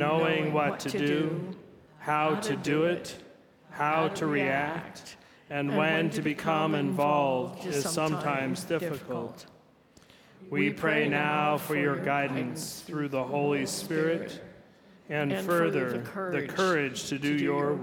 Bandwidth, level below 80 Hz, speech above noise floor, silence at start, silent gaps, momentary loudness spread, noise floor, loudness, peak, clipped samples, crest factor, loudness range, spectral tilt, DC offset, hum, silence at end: 19 kHz; -70 dBFS; 30 dB; 0 s; none; 11 LU; -59 dBFS; -29 LUFS; -12 dBFS; under 0.1%; 18 dB; 3 LU; -5 dB/octave; under 0.1%; none; 0 s